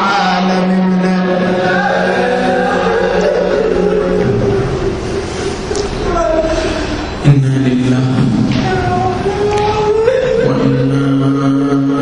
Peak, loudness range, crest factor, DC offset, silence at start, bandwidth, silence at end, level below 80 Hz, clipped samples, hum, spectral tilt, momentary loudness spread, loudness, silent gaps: 0 dBFS; 2 LU; 12 dB; under 0.1%; 0 s; 10.5 kHz; 0 s; -30 dBFS; under 0.1%; none; -6.5 dB/octave; 5 LU; -13 LUFS; none